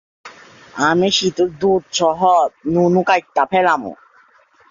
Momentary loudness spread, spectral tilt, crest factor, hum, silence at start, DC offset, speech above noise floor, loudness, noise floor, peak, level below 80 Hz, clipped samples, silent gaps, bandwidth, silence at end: 5 LU; -4.5 dB/octave; 16 dB; none; 0.25 s; under 0.1%; 36 dB; -16 LUFS; -52 dBFS; -2 dBFS; -56 dBFS; under 0.1%; none; 7.6 kHz; 0.75 s